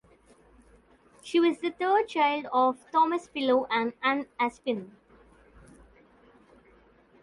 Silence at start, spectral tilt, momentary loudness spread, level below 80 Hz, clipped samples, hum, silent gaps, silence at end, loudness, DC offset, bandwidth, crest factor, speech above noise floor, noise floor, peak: 1.25 s; -4.5 dB/octave; 6 LU; -66 dBFS; under 0.1%; none; none; 2.35 s; -27 LUFS; under 0.1%; 11.5 kHz; 18 dB; 33 dB; -60 dBFS; -12 dBFS